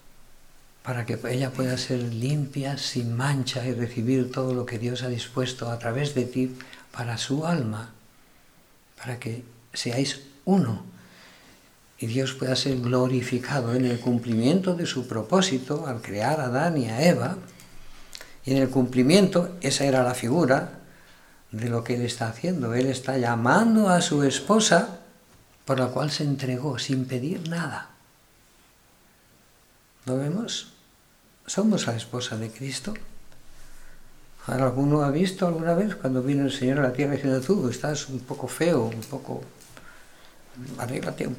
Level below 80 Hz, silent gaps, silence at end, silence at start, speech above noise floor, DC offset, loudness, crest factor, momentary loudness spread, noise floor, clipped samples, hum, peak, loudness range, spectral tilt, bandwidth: -54 dBFS; none; 0 s; 0.05 s; 34 dB; under 0.1%; -25 LUFS; 22 dB; 14 LU; -58 dBFS; under 0.1%; none; -4 dBFS; 8 LU; -5.5 dB/octave; 16.5 kHz